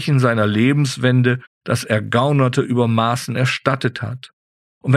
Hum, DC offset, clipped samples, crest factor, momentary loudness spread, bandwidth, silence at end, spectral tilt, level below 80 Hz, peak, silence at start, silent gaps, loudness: none; under 0.1%; under 0.1%; 16 dB; 9 LU; 13.5 kHz; 0 s; -6.5 dB/octave; -56 dBFS; -2 dBFS; 0 s; 1.47-1.61 s, 4.33-4.81 s; -18 LUFS